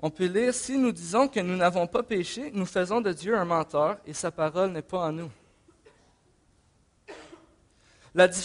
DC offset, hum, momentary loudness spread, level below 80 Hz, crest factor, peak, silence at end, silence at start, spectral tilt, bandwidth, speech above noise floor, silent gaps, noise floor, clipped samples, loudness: under 0.1%; none; 9 LU; -62 dBFS; 20 dB; -8 dBFS; 0 s; 0 s; -4.5 dB/octave; 10.5 kHz; 38 dB; none; -65 dBFS; under 0.1%; -27 LUFS